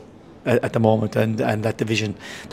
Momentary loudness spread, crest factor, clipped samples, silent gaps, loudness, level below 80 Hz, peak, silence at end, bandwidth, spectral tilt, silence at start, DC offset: 10 LU; 20 dB; under 0.1%; none; -21 LUFS; -56 dBFS; -2 dBFS; 0 s; 15 kHz; -6.5 dB/octave; 0 s; under 0.1%